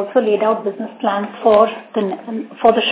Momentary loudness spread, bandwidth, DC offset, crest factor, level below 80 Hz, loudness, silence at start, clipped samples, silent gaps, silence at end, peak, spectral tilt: 11 LU; 4 kHz; under 0.1%; 16 dB; -60 dBFS; -17 LUFS; 0 s; under 0.1%; none; 0 s; 0 dBFS; -9 dB/octave